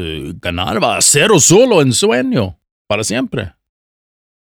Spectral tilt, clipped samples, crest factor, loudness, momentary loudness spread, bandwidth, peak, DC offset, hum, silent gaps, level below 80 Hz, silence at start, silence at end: -3.5 dB/octave; under 0.1%; 14 dB; -12 LUFS; 16 LU; over 20 kHz; 0 dBFS; under 0.1%; none; 2.71-2.85 s; -42 dBFS; 0 s; 1 s